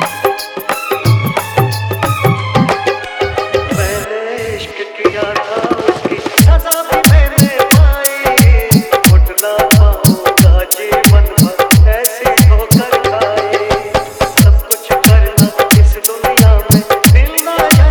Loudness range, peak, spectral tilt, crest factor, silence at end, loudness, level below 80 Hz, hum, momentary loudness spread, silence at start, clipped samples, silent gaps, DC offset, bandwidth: 6 LU; 0 dBFS; -5 dB/octave; 10 dB; 0 s; -10 LUFS; -14 dBFS; none; 8 LU; 0 s; 0.8%; none; under 0.1%; over 20 kHz